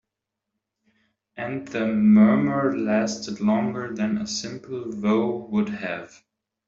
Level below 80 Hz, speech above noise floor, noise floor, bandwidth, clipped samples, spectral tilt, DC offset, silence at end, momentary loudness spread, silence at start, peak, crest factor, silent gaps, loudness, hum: -62 dBFS; 62 dB; -84 dBFS; 7.6 kHz; under 0.1%; -6 dB/octave; under 0.1%; 0.6 s; 15 LU; 1.35 s; -8 dBFS; 16 dB; none; -23 LUFS; none